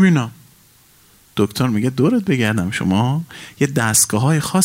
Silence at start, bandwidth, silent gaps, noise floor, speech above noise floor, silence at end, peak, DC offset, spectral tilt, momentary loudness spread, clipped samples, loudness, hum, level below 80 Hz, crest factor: 0 s; 16 kHz; none; -51 dBFS; 34 dB; 0 s; -2 dBFS; under 0.1%; -5 dB/octave; 9 LU; under 0.1%; -17 LUFS; none; -54 dBFS; 16 dB